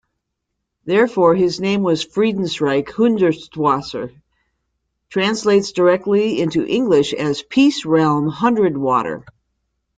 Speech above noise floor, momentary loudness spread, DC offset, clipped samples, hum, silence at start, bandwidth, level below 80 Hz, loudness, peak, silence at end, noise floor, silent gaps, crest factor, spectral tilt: 60 dB; 7 LU; under 0.1%; under 0.1%; none; 0.85 s; 9.4 kHz; -56 dBFS; -17 LUFS; -2 dBFS; 0.8 s; -77 dBFS; none; 16 dB; -6 dB/octave